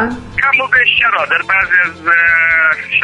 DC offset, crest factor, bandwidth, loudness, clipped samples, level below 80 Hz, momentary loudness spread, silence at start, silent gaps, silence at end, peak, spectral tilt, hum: under 0.1%; 12 dB; 10.5 kHz; -10 LUFS; under 0.1%; -44 dBFS; 4 LU; 0 s; none; 0 s; 0 dBFS; -3.5 dB/octave; none